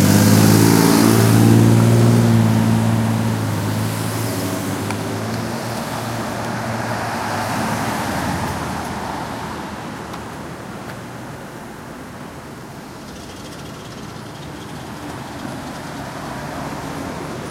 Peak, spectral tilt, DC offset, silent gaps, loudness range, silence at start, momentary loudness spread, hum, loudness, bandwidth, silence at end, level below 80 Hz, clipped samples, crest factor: 0 dBFS; -5.5 dB/octave; under 0.1%; none; 18 LU; 0 s; 21 LU; none; -18 LUFS; 16 kHz; 0 s; -44 dBFS; under 0.1%; 18 dB